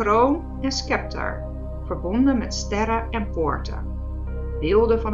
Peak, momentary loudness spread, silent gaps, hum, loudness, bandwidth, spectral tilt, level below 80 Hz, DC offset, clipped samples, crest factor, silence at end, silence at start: -6 dBFS; 13 LU; none; none; -24 LUFS; 7.8 kHz; -5.5 dB/octave; -30 dBFS; under 0.1%; under 0.1%; 16 dB; 0 s; 0 s